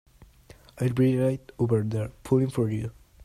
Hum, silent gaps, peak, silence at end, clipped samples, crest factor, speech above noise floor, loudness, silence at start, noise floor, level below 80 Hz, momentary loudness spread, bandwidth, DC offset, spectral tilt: none; none; -10 dBFS; 0 s; under 0.1%; 16 dB; 28 dB; -26 LUFS; 0.75 s; -53 dBFS; -54 dBFS; 9 LU; 13.5 kHz; under 0.1%; -8.5 dB/octave